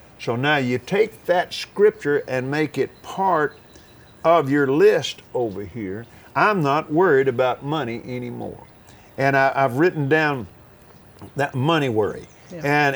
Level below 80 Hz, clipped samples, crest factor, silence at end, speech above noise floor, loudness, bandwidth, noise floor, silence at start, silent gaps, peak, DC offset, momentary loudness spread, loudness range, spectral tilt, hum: -58 dBFS; under 0.1%; 18 dB; 0 s; 27 dB; -21 LUFS; over 20 kHz; -48 dBFS; 0.2 s; none; -2 dBFS; under 0.1%; 14 LU; 2 LU; -6 dB/octave; none